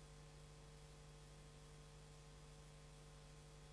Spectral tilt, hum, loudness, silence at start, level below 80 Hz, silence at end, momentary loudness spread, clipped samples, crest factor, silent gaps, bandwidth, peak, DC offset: -4.5 dB/octave; 50 Hz at -65 dBFS; -62 LUFS; 0 s; -66 dBFS; 0 s; 0 LU; under 0.1%; 12 dB; none; 11 kHz; -50 dBFS; under 0.1%